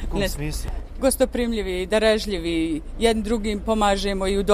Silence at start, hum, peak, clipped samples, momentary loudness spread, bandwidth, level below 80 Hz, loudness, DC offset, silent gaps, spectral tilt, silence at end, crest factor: 0 s; none; -2 dBFS; under 0.1%; 7 LU; 15.5 kHz; -32 dBFS; -23 LUFS; under 0.1%; none; -4.5 dB/octave; 0 s; 20 dB